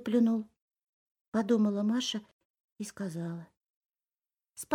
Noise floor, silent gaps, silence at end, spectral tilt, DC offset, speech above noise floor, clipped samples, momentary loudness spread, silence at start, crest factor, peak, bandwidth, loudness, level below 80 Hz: under -90 dBFS; 0.62-0.68 s, 0.83-1.15 s, 1.21-1.32 s, 2.33-2.39 s, 2.45-2.54 s, 2.60-2.76 s, 3.57-3.61 s, 3.70-3.89 s; 0 s; -5.5 dB/octave; under 0.1%; over 60 dB; under 0.1%; 18 LU; 0 s; 20 dB; -14 dBFS; 15 kHz; -31 LUFS; -78 dBFS